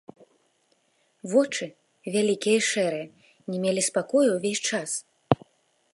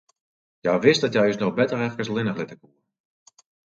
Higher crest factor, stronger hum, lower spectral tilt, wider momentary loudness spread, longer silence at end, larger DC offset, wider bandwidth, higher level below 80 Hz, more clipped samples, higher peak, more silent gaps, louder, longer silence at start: first, 26 dB vs 20 dB; neither; second, -3.5 dB/octave vs -5.5 dB/octave; first, 15 LU vs 11 LU; second, 0.6 s vs 1.2 s; neither; first, 11.5 kHz vs 8 kHz; about the same, -64 dBFS vs -66 dBFS; neither; about the same, -2 dBFS vs -4 dBFS; neither; second, -25 LUFS vs -22 LUFS; first, 1.25 s vs 0.65 s